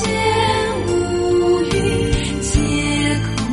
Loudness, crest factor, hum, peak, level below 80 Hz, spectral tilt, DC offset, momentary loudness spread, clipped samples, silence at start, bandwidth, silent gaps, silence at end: -18 LUFS; 14 dB; none; -2 dBFS; -28 dBFS; -5 dB/octave; under 0.1%; 3 LU; under 0.1%; 0 s; 11.5 kHz; none; 0 s